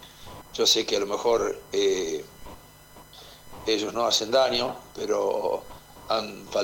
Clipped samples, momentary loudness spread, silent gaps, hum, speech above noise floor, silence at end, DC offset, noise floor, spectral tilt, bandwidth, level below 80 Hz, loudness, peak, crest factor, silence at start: under 0.1%; 24 LU; none; none; 24 dB; 0 s; under 0.1%; -50 dBFS; -2 dB/octave; 17 kHz; -54 dBFS; -25 LUFS; -10 dBFS; 16 dB; 0 s